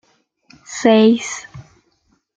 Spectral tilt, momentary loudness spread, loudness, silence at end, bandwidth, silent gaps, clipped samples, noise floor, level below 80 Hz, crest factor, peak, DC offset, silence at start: -4.5 dB/octave; 18 LU; -15 LUFS; 0.75 s; 9 kHz; none; under 0.1%; -63 dBFS; -60 dBFS; 16 dB; -2 dBFS; under 0.1%; 0.7 s